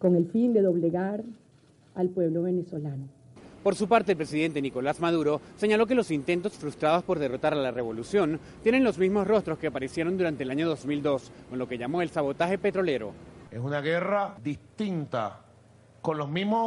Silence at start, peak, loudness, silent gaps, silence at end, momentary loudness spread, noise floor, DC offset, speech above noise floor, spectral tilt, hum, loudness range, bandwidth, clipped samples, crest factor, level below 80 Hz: 0 s; -8 dBFS; -28 LUFS; none; 0 s; 11 LU; -58 dBFS; under 0.1%; 32 dB; -7 dB/octave; none; 4 LU; 11.5 kHz; under 0.1%; 18 dB; -60 dBFS